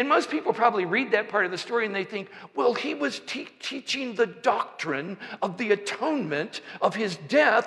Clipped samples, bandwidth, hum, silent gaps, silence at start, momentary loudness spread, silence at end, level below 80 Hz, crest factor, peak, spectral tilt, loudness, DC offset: under 0.1%; 11.5 kHz; none; none; 0 s; 10 LU; 0 s; -80 dBFS; 18 dB; -8 dBFS; -4 dB/octave; -27 LUFS; under 0.1%